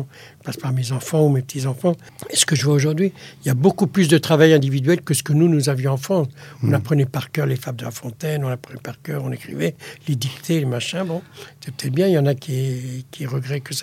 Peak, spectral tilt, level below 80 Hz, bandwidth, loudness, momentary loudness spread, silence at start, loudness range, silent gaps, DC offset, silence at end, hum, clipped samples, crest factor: 0 dBFS; -5.5 dB/octave; -62 dBFS; 16 kHz; -20 LUFS; 14 LU; 0 s; 8 LU; none; under 0.1%; 0 s; none; under 0.1%; 20 dB